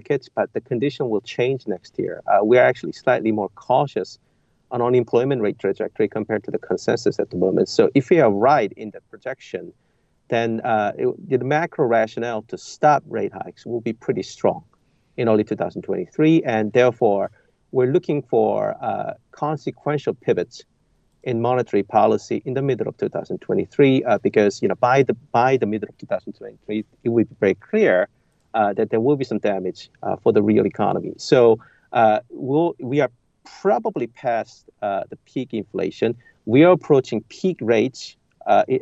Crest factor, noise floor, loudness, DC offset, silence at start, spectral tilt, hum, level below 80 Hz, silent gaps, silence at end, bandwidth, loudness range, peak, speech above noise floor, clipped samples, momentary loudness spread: 18 dB; -63 dBFS; -21 LUFS; under 0.1%; 0.1 s; -7 dB/octave; none; -66 dBFS; none; 0 s; 8.2 kHz; 4 LU; -2 dBFS; 43 dB; under 0.1%; 12 LU